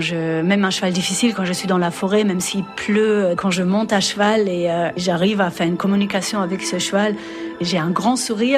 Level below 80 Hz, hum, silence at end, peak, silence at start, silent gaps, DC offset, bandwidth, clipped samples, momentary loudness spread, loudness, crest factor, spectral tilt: -58 dBFS; none; 0 s; -4 dBFS; 0 s; none; under 0.1%; 14.5 kHz; under 0.1%; 5 LU; -19 LUFS; 14 dB; -4.5 dB/octave